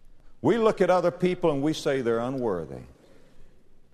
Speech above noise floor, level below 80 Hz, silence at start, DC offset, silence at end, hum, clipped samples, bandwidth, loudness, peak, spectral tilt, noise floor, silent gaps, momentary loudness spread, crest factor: 24 dB; -50 dBFS; 0.05 s; under 0.1%; 0.2 s; none; under 0.1%; 13.5 kHz; -25 LUFS; -8 dBFS; -6.5 dB/octave; -48 dBFS; none; 9 LU; 18 dB